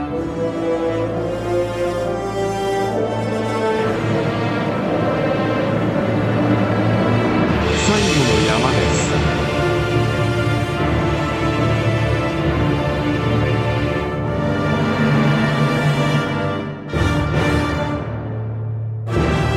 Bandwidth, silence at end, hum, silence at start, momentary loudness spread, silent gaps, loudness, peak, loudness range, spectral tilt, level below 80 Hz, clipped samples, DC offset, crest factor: 13.5 kHz; 0 s; none; 0 s; 6 LU; none; -19 LUFS; -4 dBFS; 4 LU; -6 dB/octave; -32 dBFS; under 0.1%; under 0.1%; 14 dB